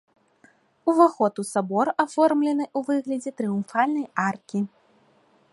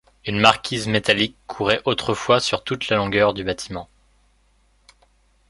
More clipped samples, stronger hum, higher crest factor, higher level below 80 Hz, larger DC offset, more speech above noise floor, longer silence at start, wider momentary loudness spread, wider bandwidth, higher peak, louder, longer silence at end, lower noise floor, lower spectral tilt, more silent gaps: neither; second, none vs 50 Hz at -45 dBFS; about the same, 20 dB vs 22 dB; second, -72 dBFS vs -50 dBFS; neither; about the same, 38 dB vs 40 dB; first, 0.85 s vs 0.25 s; about the same, 10 LU vs 11 LU; about the same, 11.5 kHz vs 11.5 kHz; second, -4 dBFS vs 0 dBFS; second, -24 LUFS vs -20 LUFS; second, 0.85 s vs 1.65 s; about the same, -61 dBFS vs -60 dBFS; first, -6 dB/octave vs -4 dB/octave; neither